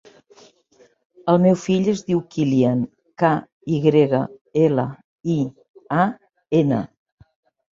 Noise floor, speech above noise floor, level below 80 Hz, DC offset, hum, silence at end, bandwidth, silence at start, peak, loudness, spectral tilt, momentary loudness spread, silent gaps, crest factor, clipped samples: -56 dBFS; 38 dB; -60 dBFS; under 0.1%; none; 0.85 s; 7.6 kHz; 1.25 s; -2 dBFS; -20 LUFS; -7.5 dB/octave; 12 LU; 3.52-3.61 s, 4.41-4.45 s, 5.04-5.19 s, 5.69-5.74 s; 20 dB; under 0.1%